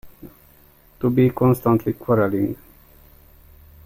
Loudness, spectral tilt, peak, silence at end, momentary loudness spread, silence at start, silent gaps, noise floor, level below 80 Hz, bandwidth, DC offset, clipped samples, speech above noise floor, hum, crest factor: -20 LUFS; -9.5 dB/octave; -6 dBFS; 1.3 s; 8 LU; 0.05 s; none; -52 dBFS; -50 dBFS; 16.5 kHz; under 0.1%; under 0.1%; 34 dB; none; 16 dB